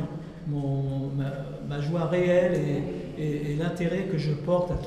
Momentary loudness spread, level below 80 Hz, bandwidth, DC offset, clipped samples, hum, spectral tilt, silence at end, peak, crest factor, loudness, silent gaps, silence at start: 11 LU; -46 dBFS; 11.5 kHz; under 0.1%; under 0.1%; none; -8 dB/octave; 0 s; -12 dBFS; 16 dB; -28 LUFS; none; 0 s